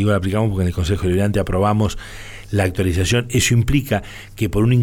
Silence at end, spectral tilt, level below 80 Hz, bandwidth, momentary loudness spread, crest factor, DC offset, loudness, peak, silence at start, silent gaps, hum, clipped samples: 0 s; -5.5 dB/octave; -32 dBFS; 18 kHz; 8 LU; 12 dB; under 0.1%; -19 LUFS; -6 dBFS; 0 s; none; none; under 0.1%